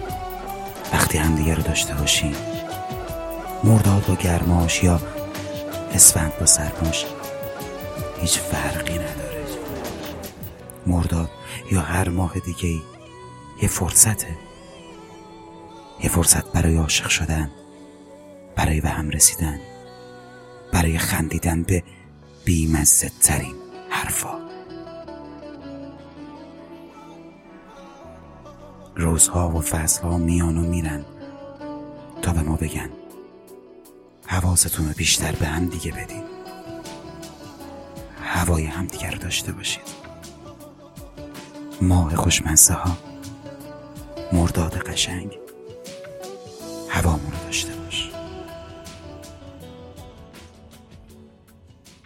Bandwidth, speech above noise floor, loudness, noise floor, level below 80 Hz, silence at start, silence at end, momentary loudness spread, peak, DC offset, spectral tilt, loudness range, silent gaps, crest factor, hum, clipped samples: 17 kHz; 30 dB; -20 LUFS; -50 dBFS; -38 dBFS; 0 s; 0.15 s; 25 LU; 0 dBFS; under 0.1%; -3.5 dB/octave; 12 LU; none; 24 dB; none; under 0.1%